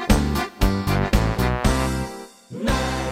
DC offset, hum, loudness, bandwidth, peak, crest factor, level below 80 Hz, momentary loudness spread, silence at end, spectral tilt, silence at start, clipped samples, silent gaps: under 0.1%; none; -22 LUFS; 16.5 kHz; -2 dBFS; 18 dB; -26 dBFS; 10 LU; 0 s; -5.5 dB/octave; 0 s; under 0.1%; none